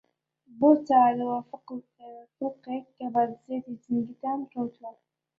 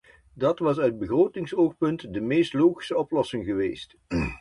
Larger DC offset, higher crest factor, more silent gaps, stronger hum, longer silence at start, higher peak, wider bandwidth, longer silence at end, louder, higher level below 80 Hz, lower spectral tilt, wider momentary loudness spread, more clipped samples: neither; about the same, 20 dB vs 16 dB; neither; neither; first, 0.55 s vs 0.35 s; about the same, -8 dBFS vs -8 dBFS; second, 7 kHz vs 11 kHz; first, 0.5 s vs 0.05 s; about the same, -27 LUFS vs -25 LUFS; second, -74 dBFS vs -48 dBFS; first, -8.5 dB/octave vs -7 dB/octave; first, 22 LU vs 7 LU; neither